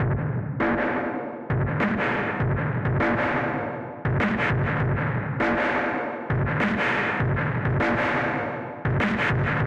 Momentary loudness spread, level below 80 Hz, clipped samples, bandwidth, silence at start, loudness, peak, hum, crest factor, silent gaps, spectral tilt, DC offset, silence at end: 6 LU; -42 dBFS; under 0.1%; 8.2 kHz; 0 s; -25 LUFS; -12 dBFS; none; 14 dB; none; -8 dB/octave; under 0.1%; 0 s